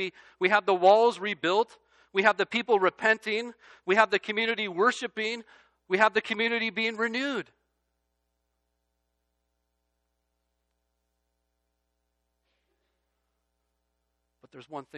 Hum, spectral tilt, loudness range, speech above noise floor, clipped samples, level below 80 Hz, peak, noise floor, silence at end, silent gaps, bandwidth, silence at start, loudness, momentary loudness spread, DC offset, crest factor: none; -4 dB/octave; 9 LU; 53 dB; under 0.1%; -78 dBFS; -6 dBFS; -79 dBFS; 0 s; none; 11 kHz; 0 s; -26 LUFS; 12 LU; under 0.1%; 24 dB